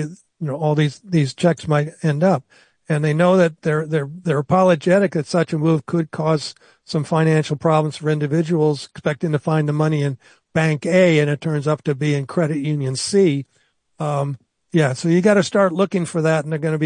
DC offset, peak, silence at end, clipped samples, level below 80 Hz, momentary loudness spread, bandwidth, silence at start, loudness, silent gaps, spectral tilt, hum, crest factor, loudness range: under 0.1%; -2 dBFS; 0 s; under 0.1%; -62 dBFS; 9 LU; 10 kHz; 0 s; -19 LUFS; none; -6.5 dB/octave; none; 16 dB; 2 LU